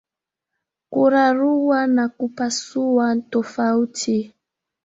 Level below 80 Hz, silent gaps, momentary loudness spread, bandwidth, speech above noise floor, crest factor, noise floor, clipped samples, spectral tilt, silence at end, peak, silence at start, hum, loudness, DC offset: -66 dBFS; none; 8 LU; 8 kHz; 66 dB; 16 dB; -85 dBFS; under 0.1%; -4 dB/octave; 0.6 s; -4 dBFS; 0.9 s; none; -20 LUFS; under 0.1%